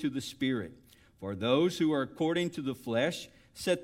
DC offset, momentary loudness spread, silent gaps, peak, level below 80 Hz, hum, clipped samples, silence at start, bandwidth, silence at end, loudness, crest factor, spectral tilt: under 0.1%; 14 LU; none; -14 dBFS; -66 dBFS; none; under 0.1%; 0 s; 16.5 kHz; 0 s; -32 LUFS; 18 dB; -5.5 dB/octave